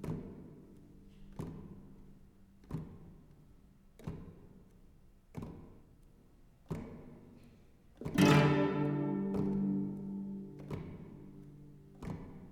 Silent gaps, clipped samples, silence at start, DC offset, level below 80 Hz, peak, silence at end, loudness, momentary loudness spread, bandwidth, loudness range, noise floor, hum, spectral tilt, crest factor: none; under 0.1%; 0 s; under 0.1%; -58 dBFS; -14 dBFS; 0 s; -35 LUFS; 26 LU; 18 kHz; 20 LU; -62 dBFS; none; -6.5 dB/octave; 24 dB